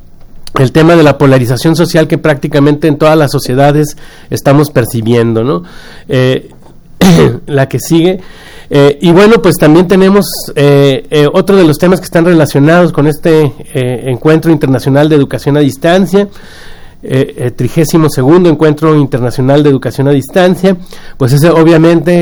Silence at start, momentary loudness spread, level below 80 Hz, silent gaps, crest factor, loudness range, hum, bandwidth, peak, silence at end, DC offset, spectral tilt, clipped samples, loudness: 0.35 s; 8 LU; -32 dBFS; none; 8 dB; 4 LU; none; over 20 kHz; 0 dBFS; 0 s; under 0.1%; -6.5 dB/octave; 3%; -8 LUFS